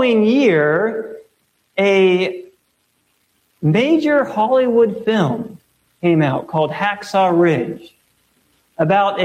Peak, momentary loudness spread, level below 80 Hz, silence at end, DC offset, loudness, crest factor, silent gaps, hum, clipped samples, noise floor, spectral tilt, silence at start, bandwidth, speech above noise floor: -4 dBFS; 13 LU; -62 dBFS; 0 s; under 0.1%; -16 LUFS; 14 dB; none; none; under 0.1%; -64 dBFS; -7 dB/octave; 0 s; 12 kHz; 49 dB